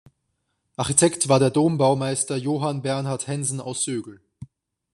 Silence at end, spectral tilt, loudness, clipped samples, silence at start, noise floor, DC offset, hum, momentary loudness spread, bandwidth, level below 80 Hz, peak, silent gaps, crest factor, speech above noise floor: 0.5 s; -4.5 dB/octave; -22 LUFS; under 0.1%; 0.8 s; -75 dBFS; under 0.1%; none; 9 LU; 13.5 kHz; -60 dBFS; -2 dBFS; none; 20 dB; 53 dB